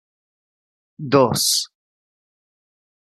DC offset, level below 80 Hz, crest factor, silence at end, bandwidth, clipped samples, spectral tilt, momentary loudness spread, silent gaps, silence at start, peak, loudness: under 0.1%; -66 dBFS; 22 dB; 1.5 s; 13.5 kHz; under 0.1%; -3.5 dB/octave; 17 LU; none; 1 s; -2 dBFS; -17 LUFS